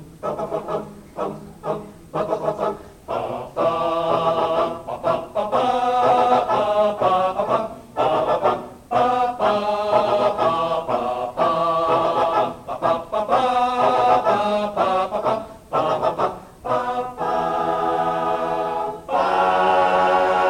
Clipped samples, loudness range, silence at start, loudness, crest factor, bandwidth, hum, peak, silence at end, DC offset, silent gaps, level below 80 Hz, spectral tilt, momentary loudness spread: under 0.1%; 4 LU; 0 s; -21 LUFS; 16 dB; 16 kHz; none; -6 dBFS; 0 s; under 0.1%; none; -52 dBFS; -5.5 dB/octave; 11 LU